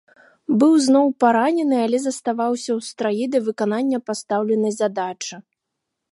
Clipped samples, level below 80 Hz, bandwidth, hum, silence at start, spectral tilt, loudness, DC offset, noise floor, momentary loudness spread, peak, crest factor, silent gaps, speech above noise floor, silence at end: under 0.1%; -76 dBFS; 11.5 kHz; none; 0.5 s; -5 dB/octave; -20 LUFS; under 0.1%; -80 dBFS; 10 LU; -4 dBFS; 18 dB; none; 61 dB; 0.7 s